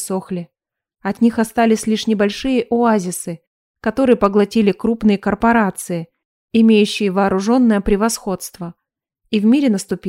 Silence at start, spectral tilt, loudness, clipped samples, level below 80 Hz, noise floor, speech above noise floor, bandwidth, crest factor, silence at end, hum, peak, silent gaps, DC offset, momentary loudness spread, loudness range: 0 s; -5.5 dB/octave; -16 LUFS; under 0.1%; -42 dBFS; -70 dBFS; 54 dB; 15.5 kHz; 16 dB; 0 s; none; 0 dBFS; 3.47-3.74 s, 6.25-6.48 s; under 0.1%; 12 LU; 2 LU